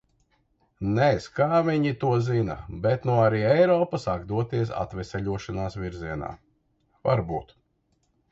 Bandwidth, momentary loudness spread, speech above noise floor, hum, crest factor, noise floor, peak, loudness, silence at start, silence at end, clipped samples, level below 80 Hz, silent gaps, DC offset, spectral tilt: 8 kHz; 12 LU; 46 dB; none; 18 dB; -70 dBFS; -8 dBFS; -25 LUFS; 0.8 s; 0.9 s; under 0.1%; -48 dBFS; none; under 0.1%; -8 dB/octave